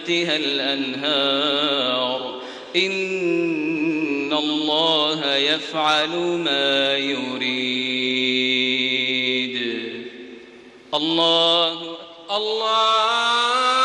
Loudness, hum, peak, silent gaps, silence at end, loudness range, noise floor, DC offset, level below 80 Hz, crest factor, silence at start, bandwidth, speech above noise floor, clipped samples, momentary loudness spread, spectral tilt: -20 LUFS; none; -6 dBFS; none; 0 s; 2 LU; -44 dBFS; under 0.1%; -68 dBFS; 16 dB; 0 s; 10.5 kHz; 23 dB; under 0.1%; 9 LU; -3 dB/octave